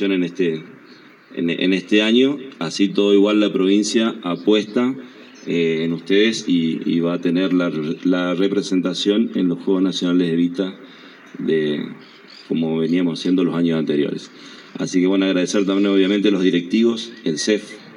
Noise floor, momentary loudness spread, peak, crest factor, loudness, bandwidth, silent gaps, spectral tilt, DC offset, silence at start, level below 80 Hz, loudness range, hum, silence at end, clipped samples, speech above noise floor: -45 dBFS; 10 LU; -2 dBFS; 16 dB; -19 LUFS; 11 kHz; none; -5.5 dB/octave; under 0.1%; 0 s; -82 dBFS; 4 LU; none; 0 s; under 0.1%; 27 dB